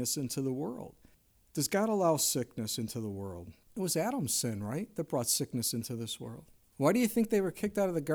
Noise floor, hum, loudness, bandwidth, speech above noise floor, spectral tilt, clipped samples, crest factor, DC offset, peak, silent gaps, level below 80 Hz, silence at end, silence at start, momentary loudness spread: -59 dBFS; none; -32 LUFS; over 20 kHz; 27 dB; -4 dB/octave; under 0.1%; 18 dB; under 0.1%; -16 dBFS; none; -66 dBFS; 0 s; 0 s; 13 LU